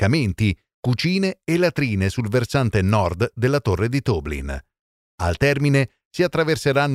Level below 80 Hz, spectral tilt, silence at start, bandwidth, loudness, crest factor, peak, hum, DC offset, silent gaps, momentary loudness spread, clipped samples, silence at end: -40 dBFS; -6.5 dB/octave; 0 s; 15 kHz; -21 LUFS; 16 dB; -4 dBFS; none; under 0.1%; 0.74-0.83 s, 4.79-5.18 s, 6.05-6.11 s; 8 LU; under 0.1%; 0 s